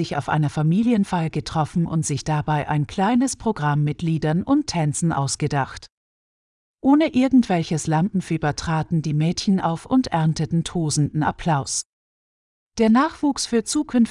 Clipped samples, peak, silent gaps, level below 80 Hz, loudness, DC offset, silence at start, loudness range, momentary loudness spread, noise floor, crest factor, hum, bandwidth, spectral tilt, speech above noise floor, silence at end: under 0.1%; -6 dBFS; 5.92-6.78 s, 11.85-12.67 s; -48 dBFS; -21 LUFS; under 0.1%; 0 s; 2 LU; 6 LU; under -90 dBFS; 14 dB; none; 12 kHz; -5.5 dB/octave; over 70 dB; 0 s